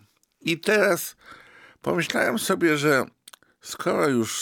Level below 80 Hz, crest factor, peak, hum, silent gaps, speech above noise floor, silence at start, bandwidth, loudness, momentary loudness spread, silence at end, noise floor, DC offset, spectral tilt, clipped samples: -70 dBFS; 20 dB; -6 dBFS; none; none; 29 dB; 0.45 s; 19.5 kHz; -23 LUFS; 14 LU; 0 s; -52 dBFS; under 0.1%; -4 dB/octave; under 0.1%